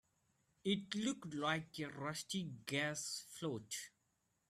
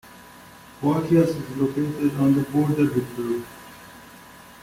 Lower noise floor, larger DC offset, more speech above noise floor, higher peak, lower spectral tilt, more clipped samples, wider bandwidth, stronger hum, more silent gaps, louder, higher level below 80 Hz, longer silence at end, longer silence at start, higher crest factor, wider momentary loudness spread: first, -83 dBFS vs -46 dBFS; neither; first, 40 dB vs 24 dB; second, -22 dBFS vs -8 dBFS; second, -3.5 dB/octave vs -8 dB/octave; neither; about the same, 15 kHz vs 16.5 kHz; neither; neither; second, -42 LUFS vs -23 LUFS; second, -80 dBFS vs -56 dBFS; first, 0.6 s vs 0.1 s; first, 0.65 s vs 0.05 s; first, 22 dB vs 16 dB; second, 7 LU vs 23 LU